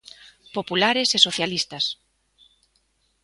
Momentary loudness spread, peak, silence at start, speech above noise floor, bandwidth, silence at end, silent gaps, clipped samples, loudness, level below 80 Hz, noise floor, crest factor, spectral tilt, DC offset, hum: 15 LU; 0 dBFS; 0.25 s; 45 dB; 11.5 kHz; 1.3 s; none; under 0.1%; -21 LUFS; -64 dBFS; -68 dBFS; 26 dB; -2 dB/octave; under 0.1%; none